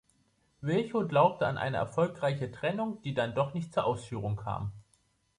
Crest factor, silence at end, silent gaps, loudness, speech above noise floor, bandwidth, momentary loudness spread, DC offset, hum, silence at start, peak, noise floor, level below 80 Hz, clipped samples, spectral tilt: 20 dB; 0.55 s; none; -31 LUFS; 41 dB; 11 kHz; 10 LU; under 0.1%; none; 0.6 s; -12 dBFS; -71 dBFS; -60 dBFS; under 0.1%; -7 dB/octave